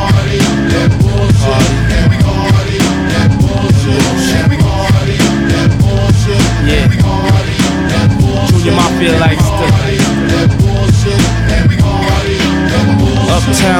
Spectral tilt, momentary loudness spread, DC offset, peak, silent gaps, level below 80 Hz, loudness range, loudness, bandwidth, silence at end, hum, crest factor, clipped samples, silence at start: -5.5 dB/octave; 2 LU; under 0.1%; 0 dBFS; none; -20 dBFS; 0 LU; -10 LUFS; 16 kHz; 0 s; none; 8 dB; under 0.1%; 0 s